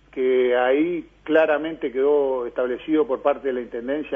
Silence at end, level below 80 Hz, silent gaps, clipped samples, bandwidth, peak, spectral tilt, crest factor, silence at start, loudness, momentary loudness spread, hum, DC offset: 0 s; -56 dBFS; none; under 0.1%; 3.7 kHz; -4 dBFS; -7.5 dB/octave; 18 dB; 0.15 s; -22 LUFS; 8 LU; none; under 0.1%